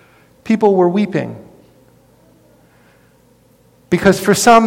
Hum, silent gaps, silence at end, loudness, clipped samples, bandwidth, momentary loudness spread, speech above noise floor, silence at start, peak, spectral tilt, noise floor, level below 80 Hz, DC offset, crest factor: none; none; 0 s; -14 LUFS; under 0.1%; 17 kHz; 18 LU; 39 dB; 0.45 s; 0 dBFS; -5 dB/octave; -51 dBFS; -50 dBFS; under 0.1%; 16 dB